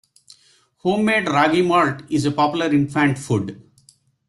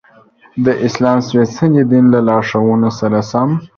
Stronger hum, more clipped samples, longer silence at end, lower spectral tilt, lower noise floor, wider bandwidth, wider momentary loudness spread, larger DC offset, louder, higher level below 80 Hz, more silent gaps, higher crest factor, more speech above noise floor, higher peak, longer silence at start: neither; neither; first, 0.7 s vs 0.1 s; second, -6 dB/octave vs -7.5 dB/octave; first, -57 dBFS vs -46 dBFS; first, 12 kHz vs 7 kHz; about the same, 7 LU vs 6 LU; neither; second, -19 LUFS vs -13 LUFS; second, -56 dBFS vs -50 dBFS; neither; first, 18 dB vs 12 dB; first, 39 dB vs 34 dB; about the same, -2 dBFS vs 0 dBFS; first, 0.85 s vs 0.55 s